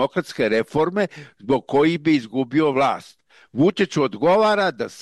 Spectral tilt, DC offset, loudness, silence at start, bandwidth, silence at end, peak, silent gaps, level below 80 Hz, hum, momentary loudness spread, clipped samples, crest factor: -6 dB/octave; under 0.1%; -20 LUFS; 0 s; 12 kHz; 0 s; -8 dBFS; none; -60 dBFS; none; 7 LU; under 0.1%; 14 dB